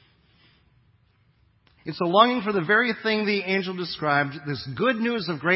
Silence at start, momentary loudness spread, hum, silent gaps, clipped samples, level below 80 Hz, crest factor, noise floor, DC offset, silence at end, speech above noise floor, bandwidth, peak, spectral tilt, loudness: 1.85 s; 12 LU; none; none; under 0.1%; -64 dBFS; 24 dB; -63 dBFS; under 0.1%; 0 s; 39 dB; 5.8 kHz; -2 dBFS; -9.5 dB/octave; -23 LUFS